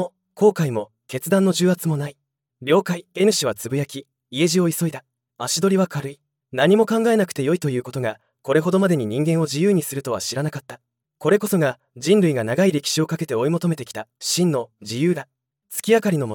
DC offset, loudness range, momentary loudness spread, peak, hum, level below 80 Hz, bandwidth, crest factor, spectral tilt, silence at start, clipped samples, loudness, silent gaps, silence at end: under 0.1%; 2 LU; 13 LU; -4 dBFS; none; -70 dBFS; 18 kHz; 16 dB; -5 dB/octave; 0 s; under 0.1%; -21 LUFS; none; 0 s